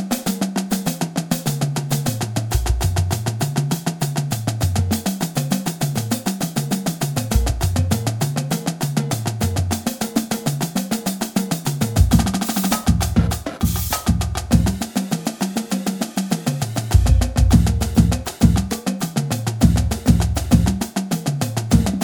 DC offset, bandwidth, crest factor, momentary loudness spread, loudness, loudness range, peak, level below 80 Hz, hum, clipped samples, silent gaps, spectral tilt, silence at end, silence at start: under 0.1%; 19.5 kHz; 18 dB; 6 LU; -20 LUFS; 4 LU; 0 dBFS; -26 dBFS; none; under 0.1%; none; -5.5 dB/octave; 0 s; 0 s